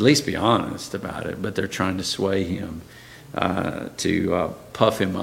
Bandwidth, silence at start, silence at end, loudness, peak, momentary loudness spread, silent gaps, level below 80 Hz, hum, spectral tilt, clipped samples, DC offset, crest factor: 16.5 kHz; 0 s; 0 s; -24 LUFS; -2 dBFS; 11 LU; none; -50 dBFS; none; -5 dB/octave; under 0.1%; under 0.1%; 22 dB